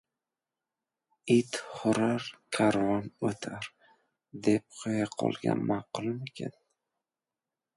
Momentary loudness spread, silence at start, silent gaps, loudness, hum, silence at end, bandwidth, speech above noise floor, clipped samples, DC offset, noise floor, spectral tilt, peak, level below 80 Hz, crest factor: 14 LU; 1.25 s; none; -31 LUFS; none; 1.25 s; 11.5 kHz; over 60 dB; under 0.1%; under 0.1%; under -90 dBFS; -5.5 dB/octave; -12 dBFS; -68 dBFS; 20 dB